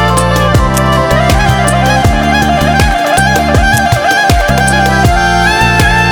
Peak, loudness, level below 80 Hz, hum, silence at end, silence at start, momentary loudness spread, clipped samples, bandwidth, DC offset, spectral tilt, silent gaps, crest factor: 0 dBFS; -9 LUFS; -16 dBFS; none; 0 s; 0 s; 2 LU; 0.8%; over 20 kHz; under 0.1%; -4.5 dB/octave; none; 8 dB